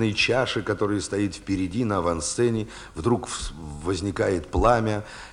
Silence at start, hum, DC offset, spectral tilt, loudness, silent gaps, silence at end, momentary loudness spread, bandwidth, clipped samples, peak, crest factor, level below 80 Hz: 0 s; none; under 0.1%; -5 dB/octave; -25 LUFS; none; 0 s; 11 LU; 11.5 kHz; under 0.1%; -4 dBFS; 20 dB; -40 dBFS